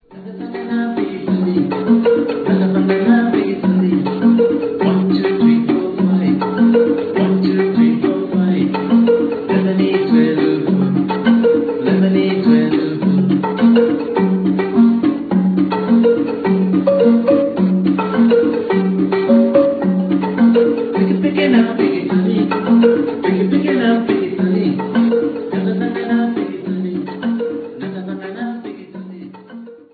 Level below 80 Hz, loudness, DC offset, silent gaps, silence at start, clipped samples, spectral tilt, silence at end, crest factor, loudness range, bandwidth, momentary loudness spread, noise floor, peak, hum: -56 dBFS; -15 LUFS; under 0.1%; none; 0.1 s; under 0.1%; -11 dB/octave; 0.2 s; 14 dB; 4 LU; 4.8 kHz; 9 LU; -35 dBFS; 0 dBFS; none